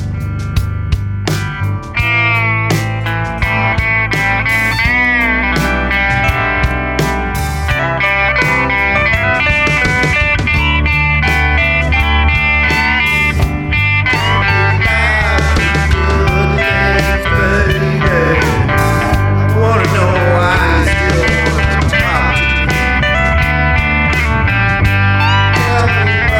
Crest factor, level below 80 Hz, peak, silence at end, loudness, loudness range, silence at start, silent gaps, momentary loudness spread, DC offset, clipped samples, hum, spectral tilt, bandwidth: 10 dB; -20 dBFS; -2 dBFS; 0 s; -12 LUFS; 2 LU; 0 s; none; 5 LU; under 0.1%; under 0.1%; none; -5.5 dB/octave; 17 kHz